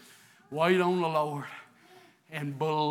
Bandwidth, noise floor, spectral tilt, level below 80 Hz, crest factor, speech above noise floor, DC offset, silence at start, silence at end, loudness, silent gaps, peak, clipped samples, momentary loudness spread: 15 kHz; -58 dBFS; -6.5 dB/octave; -86 dBFS; 20 dB; 30 dB; under 0.1%; 0.5 s; 0 s; -29 LUFS; none; -12 dBFS; under 0.1%; 17 LU